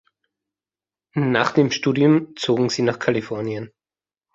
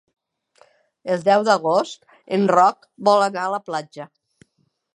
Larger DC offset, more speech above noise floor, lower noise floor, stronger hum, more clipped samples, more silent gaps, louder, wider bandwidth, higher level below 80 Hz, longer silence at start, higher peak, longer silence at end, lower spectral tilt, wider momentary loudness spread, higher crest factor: neither; first, over 70 dB vs 50 dB; first, under -90 dBFS vs -69 dBFS; first, 50 Hz at -60 dBFS vs none; neither; neither; about the same, -20 LUFS vs -19 LUFS; second, 7.8 kHz vs 11 kHz; first, -62 dBFS vs -76 dBFS; about the same, 1.15 s vs 1.05 s; about the same, -2 dBFS vs -2 dBFS; second, 0.65 s vs 0.9 s; about the same, -6 dB/octave vs -5 dB/octave; second, 12 LU vs 21 LU; about the same, 20 dB vs 20 dB